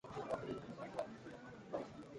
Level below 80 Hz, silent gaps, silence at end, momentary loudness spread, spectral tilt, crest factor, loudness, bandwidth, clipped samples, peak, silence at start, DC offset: -72 dBFS; none; 0 s; 9 LU; -6.5 dB/octave; 20 dB; -48 LUFS; 11 kHz; under 0.1%; -28 dBFS; 0.05 s; under 0.1%